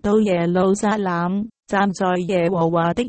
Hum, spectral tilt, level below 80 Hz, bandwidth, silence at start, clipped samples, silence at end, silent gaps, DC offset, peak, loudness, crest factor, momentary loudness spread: none; -6.5 dB/octave; -50 dBFS; 8.8 kHz; 0.05 s; under 0.1%; 0 s; none; under 0.1%; -6 dBFS; -20 LUFS; 12 dB; 5 LU